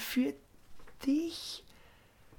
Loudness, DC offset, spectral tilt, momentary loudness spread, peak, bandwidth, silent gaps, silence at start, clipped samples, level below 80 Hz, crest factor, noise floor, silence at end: -35 LUFS; under 0.1%; -3.5 dB/octave; 13 LU; -22 dBFS; 19 kHz; none; 0 s; under 0.1%; -62 dBFS; 16 dB; -60 dBFS; 0.05 s